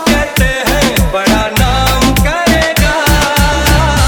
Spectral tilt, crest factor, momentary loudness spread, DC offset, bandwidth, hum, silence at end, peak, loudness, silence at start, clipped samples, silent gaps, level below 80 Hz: -4 dB/octave; 10 dB; 2 LU; under 0.1%; over 20 kHz; none; 0 s; 0 dBFS; -10 LUFS; 0 s; under 0.1%; none; -16 dBFS